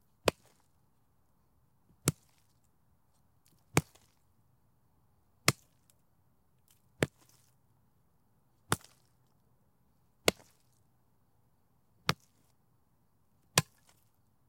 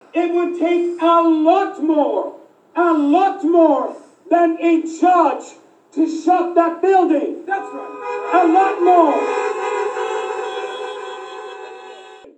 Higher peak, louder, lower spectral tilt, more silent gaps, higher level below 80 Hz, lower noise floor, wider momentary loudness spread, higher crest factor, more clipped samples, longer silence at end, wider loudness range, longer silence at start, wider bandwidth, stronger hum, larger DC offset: second, -6 dBFS vs 0 dBFS; second, -34 LUFS vs -17 LUFS; about the same, -3 dB/octave vs -3.5 dB/octave; neither; first, -66 dBFS vs -84 dBFS; first, -73 dBFS vs -39 dBFS; second, 6 LU vs 16 LU; first, 34 dB vs 16 dB; neither; first, 0.85 s vs 0.25 s; first, 6 LU vs 3 LU; about the same, 0.25 s vs 0.15 s; first, 16.5 kHz vs 8.4 kHz; neither; neither